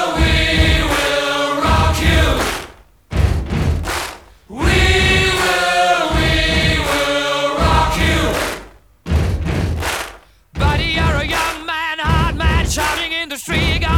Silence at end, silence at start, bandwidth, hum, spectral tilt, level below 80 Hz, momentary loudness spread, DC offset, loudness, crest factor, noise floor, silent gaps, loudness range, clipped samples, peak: 0 s; 0 s; 17.5 kHz; none; -4.5 dB/octave; -22 dBFS; 8 LU; 0.1%; -16 LUFS; 14 dB; -39 dBFS; none; 5 LU; under 0.1%; -2 dBFS